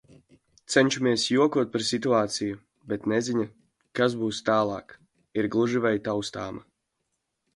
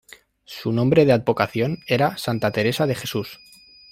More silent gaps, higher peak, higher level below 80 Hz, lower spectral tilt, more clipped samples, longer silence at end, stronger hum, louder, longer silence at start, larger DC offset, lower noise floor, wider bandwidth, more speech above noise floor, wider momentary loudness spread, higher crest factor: neither; second, -6 dBFS vs -2 dBFS; second, -64 dBFS vs -56 dBFS; second, -4.5 dB/octave vs -6 dB/octave; neither; first, 0.95 s vs 0.55 s; neither; second, -26 LUFS vs -21 LUFS; first, 0.7 s vs 0.5 s; neither; first, -79 dBFS vs -46 dBFS; second, 11.5 kHz vs 16.5 kHz; first, 54 dB vs 26 dB; about the same, 14 LU vs 13 LU; about the same, 22 dB vs 20 dB